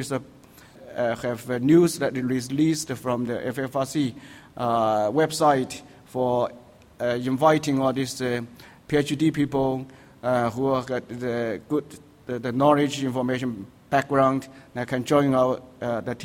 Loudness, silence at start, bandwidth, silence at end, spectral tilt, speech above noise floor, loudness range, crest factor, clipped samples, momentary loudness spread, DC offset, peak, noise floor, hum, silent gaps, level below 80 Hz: -24 LUFS; 0 s; 16.5 kHz; 0 s; -6 dB/octave; 24 dB; 2 LU; 18 dB; under 0.1%; 12 LU; under 0.1%; -6 dBFS; -47 dBFS; none; none; -58 dBFS